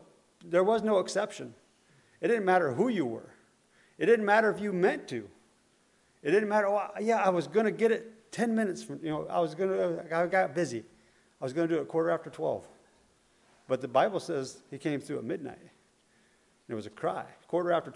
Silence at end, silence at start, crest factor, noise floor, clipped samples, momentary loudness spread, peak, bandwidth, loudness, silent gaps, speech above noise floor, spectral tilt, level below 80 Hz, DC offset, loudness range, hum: 0.05 s; 0.45 s; 20 dB; -67 dBFS; under 0.1%; 14 LU; -10 dBFS; 11.5 kHz; -30 LUFS; none; 38 dB; -6 dB/octave; -76 dBFS; under 0.1%; 6 LU; none